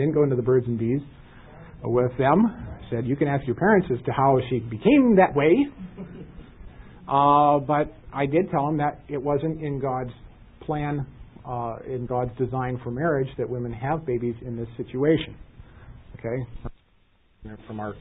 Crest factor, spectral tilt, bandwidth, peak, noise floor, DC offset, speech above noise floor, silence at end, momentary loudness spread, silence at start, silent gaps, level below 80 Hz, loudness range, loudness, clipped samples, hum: 18 dB; -12 dB/octave; 4 kHz; -6 dBFS; -61 dBFS; under 0.1%; 38 dB; 0 s; 19 LU; 0 s; none; -48 dBFS; 9 LU; -24 LUFS; under 0.1%; none